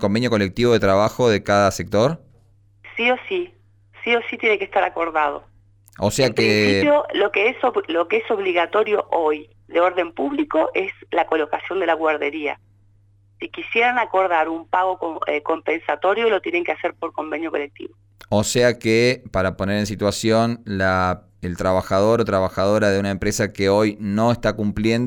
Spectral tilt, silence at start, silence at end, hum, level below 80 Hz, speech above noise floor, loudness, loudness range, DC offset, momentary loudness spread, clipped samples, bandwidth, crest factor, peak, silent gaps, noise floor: -5 dB/octave; 0 s; 0 s; none; -48 dBFS; 35 dB; -20 LUFS; 3 LU; under 0.1%; 9 LU; under 0.1%; 19 kHz; 16 dB; -6 dBFS; none; -55 dBFS